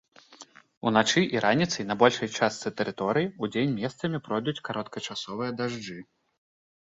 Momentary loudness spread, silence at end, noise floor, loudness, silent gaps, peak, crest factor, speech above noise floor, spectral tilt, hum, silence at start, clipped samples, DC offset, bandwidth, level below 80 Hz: 11 LU; 0.8 s; -52 dBFS; -27 LUFS; 0.77-0.81 s; -4 dBFS; 24 dB; 25 dB; -4.5 dB/octave; none; 0.3 s; under 0.1%; under 0.1%; 8 kHz; -66 dBFS